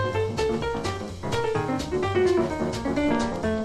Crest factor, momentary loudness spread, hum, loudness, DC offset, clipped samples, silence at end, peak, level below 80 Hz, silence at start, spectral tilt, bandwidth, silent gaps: 14 dB; 7 LU; none; -26 LUFS; under 0.1%; under 0.1%; 0 s; -10 dBFS; -42 dBFS; 0 s; -6 dB/octave; 13 kHz; none